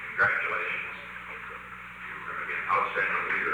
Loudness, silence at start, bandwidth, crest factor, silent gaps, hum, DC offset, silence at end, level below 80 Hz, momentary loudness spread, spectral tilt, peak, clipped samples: -29 LUFS; 0 s; over 20 kHz; 18 dB; none; 60 Hz at -60 dBFS; under 0.1%; 0 s; -62 dBFS; 15 LU; -4.5 dB/octave; -12 dBFS; under 0.1%